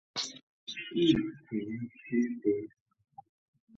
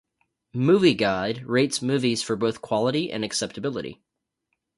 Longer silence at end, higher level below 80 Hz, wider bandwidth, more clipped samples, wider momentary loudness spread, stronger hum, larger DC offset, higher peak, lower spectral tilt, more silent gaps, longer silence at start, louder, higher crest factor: first, 1.1 s vs 0.85 s; about the same, -64 dBFS vs -60 dBFS; second, 8 kHz vs 11.5 kHz; neither; about the same, 14 LU vs 12 LU; neither; neither; second, -14 dBFS vs -6 dBFS; about the same, -5 dB/octave vs -5 dB/octave; first, 0.43-0.67 s vs none; second, 0.15 s vs 0.55 s; second, -33 LUFS vs -24 LUFS; about the same, 20 dB vs 18 dB